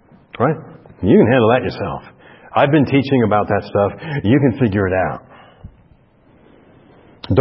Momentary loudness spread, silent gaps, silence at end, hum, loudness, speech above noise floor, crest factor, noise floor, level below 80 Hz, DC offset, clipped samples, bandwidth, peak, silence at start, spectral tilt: 13 LU; none; 0 s; none; -16 LUFS; 36 dB; 18 dB; -51 dBFS; -46 dBFS; under 0.1%; under 0.1%; 5.8 kHz; 0 dBFS; 0.4 s; -12.5 dB/octave